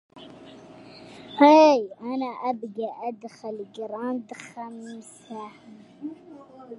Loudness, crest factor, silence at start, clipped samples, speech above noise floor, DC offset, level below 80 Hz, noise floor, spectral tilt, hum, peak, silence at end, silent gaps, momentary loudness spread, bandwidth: -22 LUFS; 22 dB; 0.15 s; under 0.1%; 22 dB; under 0.1%; -76 dBFS; -46 dBFS; -4.5 dB/octave; none; -2 dBFS; 0 s; none; 28 LU; 11.5 kHz